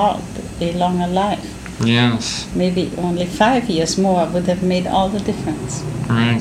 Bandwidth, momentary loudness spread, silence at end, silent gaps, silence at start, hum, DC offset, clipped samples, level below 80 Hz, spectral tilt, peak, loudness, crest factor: 14.5 kHz; 9 LU; 0 s; none; 0 s; none; under 0.1%; under 0.1%; -40 dBFS; -5.5 dB/octave; -2 dBFS; -18 LUFS; 16 dB